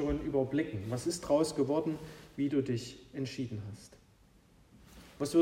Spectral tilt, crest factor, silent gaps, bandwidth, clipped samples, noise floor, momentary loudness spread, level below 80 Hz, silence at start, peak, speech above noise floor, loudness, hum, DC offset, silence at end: -6 dB/octave; 18 dB; none; 16 kHz; under 0.1%; -63 dBFS; 14 LU; -54 dBFS; 0 s; -16 dBFS; 29 dB; -34 LUFS; none; under 0.1%; 0 s